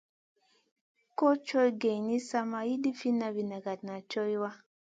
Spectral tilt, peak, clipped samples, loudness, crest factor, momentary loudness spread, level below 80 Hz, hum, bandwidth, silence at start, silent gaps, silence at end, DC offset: -5.5 dB/octave; -14 dBFS; under 0.1%; -32 LUFS; 18 dB; 11 LU; -82 dBFS; none; 9.2 kHz; 1.2 s; none; 0.3 s; under 0.1%